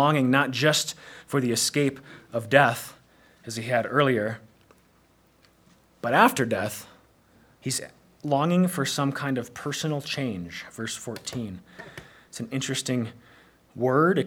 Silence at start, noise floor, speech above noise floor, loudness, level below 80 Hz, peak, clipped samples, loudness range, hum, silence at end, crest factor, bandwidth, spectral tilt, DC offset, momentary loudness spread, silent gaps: 0 s; -61 dBFS; 36 dB; -25 LUFS; -66 dBFS; 0 dBFS; under 0.1%; 7 LU; none; 0 s; 26 dB; over 20 kHz; -4.5 dB/octave; under 0.1%; 20 LU; none